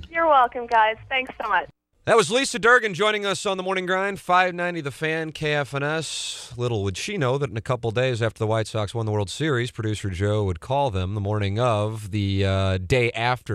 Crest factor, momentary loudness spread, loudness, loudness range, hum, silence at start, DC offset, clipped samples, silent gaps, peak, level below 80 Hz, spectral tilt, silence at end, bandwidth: 18 dB; 9 LU; -23 LUFS; 4 LU; none; 0 s; under 0.1%; under 0.1%; none; -4 dBFS; -50 dBFS; -5 dB/octave; 0 s; 14 kHz